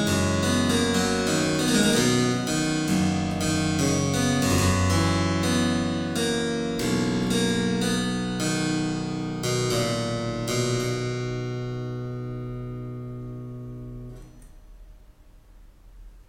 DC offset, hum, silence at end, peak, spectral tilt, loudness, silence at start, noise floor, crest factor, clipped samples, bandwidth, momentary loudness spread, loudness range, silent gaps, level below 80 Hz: under 0.1%; none; 0.05 s; -8 dBFS; -4.5 dB/octave; -24 LUFS; 0 s; -51 dBFS; 16 dB; under 0.1%; 16.5 kHz; 13 LU; 14 LU; none; -46 dBFS